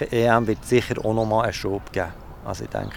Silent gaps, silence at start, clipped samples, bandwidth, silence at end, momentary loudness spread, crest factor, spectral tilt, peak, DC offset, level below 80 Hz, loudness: none; 0 s; under 0.1%; 18.5 kHz; 0 s; 13 LU; 22 dB; -6 dB/octave; -2 dBFS; under 0.1%; -42 dBFS; -23 LUFS